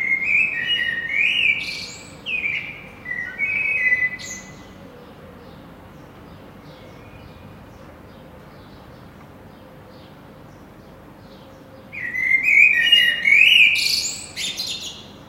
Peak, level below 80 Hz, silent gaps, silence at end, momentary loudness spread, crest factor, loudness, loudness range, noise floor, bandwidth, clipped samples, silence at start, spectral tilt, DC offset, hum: -2 dBFS; -54 dBFS; none; 0.05 s; 20 LU; 22 dB; -16 LUFS; 13 LU; -43 dBFS; 16 kHz; under 0.1%; 0 s; -0.5 dB/octave; under 0.1%; none